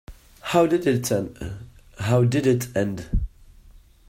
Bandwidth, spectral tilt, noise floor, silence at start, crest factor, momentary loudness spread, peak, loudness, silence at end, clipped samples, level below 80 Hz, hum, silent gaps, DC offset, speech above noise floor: 16 kHz; -6 dB/octave; -50 dBFS; 0.1 s; 18 dB; 16 LU; -6 dBFS; -23 LUFS; 0.8 s; under 0.1%; -36 dBFS; none; none; under 0.1%; 28 dB